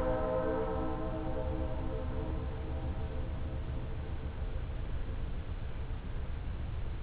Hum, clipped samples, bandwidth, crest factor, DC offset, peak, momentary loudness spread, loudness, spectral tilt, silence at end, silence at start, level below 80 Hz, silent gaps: none; under 0.1%; 4 kHz; 16 dB; under 0.1%; -20 dBFS; 8 LU; -39 LUFS; -7.5 dB/octave; 0 s; 0 s; -38 dBFS; none